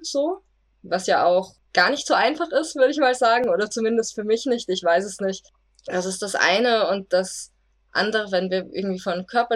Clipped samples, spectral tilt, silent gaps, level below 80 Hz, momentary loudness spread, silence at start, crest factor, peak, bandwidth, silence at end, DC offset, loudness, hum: under 0.1%; -3.5 dB/octave; none; -64 dBFS; 9 LU; 0 s; 18 dB; -4 dBFS; 13 kHz; 0 s; under 0.1%; -22 LUFS; none